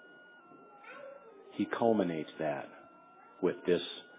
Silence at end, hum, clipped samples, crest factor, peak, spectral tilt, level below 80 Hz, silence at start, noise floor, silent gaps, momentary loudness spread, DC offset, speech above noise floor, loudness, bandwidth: 0 s; none; under 0.1%; 22 dB; -14 dBFS; -4.5 dB/octave; -74 dBFS; 0 s; -58 dBFS; none; 25 LU; under 0.1%; 25 dB; -34 LUFS; 4 kHz